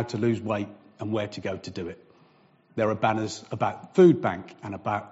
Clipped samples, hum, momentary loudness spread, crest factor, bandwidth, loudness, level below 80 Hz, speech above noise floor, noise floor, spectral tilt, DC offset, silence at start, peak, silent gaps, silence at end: under 0.1%; none; 19 LU; 20 dB; 8 kHz; -26 LUFS; -64 dBFS; 34 dB; -60 dBFS; -6.5 dB/octave; under 0.1%; 0 s; -6 dBFS; none; 0.05 s